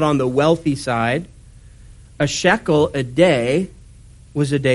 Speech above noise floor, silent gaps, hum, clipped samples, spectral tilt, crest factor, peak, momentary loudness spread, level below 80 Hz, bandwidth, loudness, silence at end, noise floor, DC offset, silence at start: 26 dB; none; none; under 0.1%; -5.5 dB/octave; 18 dB; 0 dBFS; 8 LU; -44 dBFS; 11.5 kHz; -18 LUFS; 0 s; -43 dBFS; under 0.1%; 0 s